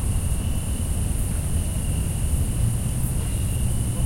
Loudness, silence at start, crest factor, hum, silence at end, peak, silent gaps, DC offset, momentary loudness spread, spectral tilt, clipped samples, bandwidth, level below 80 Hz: -25 LUFS; 0 s; 12 dB; none; 0 s; -10 dBFS; none; under 0.1%; 2 LU; -5.5 dB/octave; under 0.1%; 16.5 kHz; -26 dBFS